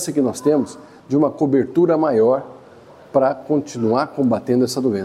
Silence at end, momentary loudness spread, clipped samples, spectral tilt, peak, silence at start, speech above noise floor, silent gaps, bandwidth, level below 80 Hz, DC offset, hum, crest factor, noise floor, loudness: 0 s; 6 LU; under 0.1%; -6.5 dB/octave; -2 dBFS; 0 s; 26 dB; none; 14.5 kHz; -62 dBFS; under 0.1%; none; 16 dB; -44 dBFS; -18 LUFS